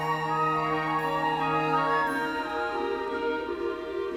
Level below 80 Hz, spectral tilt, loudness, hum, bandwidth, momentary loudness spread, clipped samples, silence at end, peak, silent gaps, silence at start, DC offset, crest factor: -58 dBFS; -6 dB/octave; -28 LUFS; none; 16.5 kHz; 6 LU; under 0.1%; 0 s; -14 dBFS; none; 0 s; under 0.1%; 14 dB